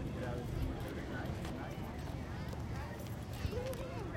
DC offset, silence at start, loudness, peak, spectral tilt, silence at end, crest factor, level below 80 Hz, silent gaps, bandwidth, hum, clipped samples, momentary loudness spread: under 0.1%; 0 s; -42 LUFS; -24 dBFS; -6.5 dB/octave; 0 s; 16 dB; -48 dBFS; none; 16.5 kHz; none; under 0.1%; 3 LU